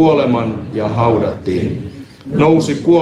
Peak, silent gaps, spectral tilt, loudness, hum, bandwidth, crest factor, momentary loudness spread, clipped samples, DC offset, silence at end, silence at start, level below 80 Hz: -2 dBFS; none; -7.5 dB/octave; -15 LUFS; none; 11 kHz; 14 dB; 12 LU; under 0.1%; under 0.1%; 0 s; 0 s; -42 dBFS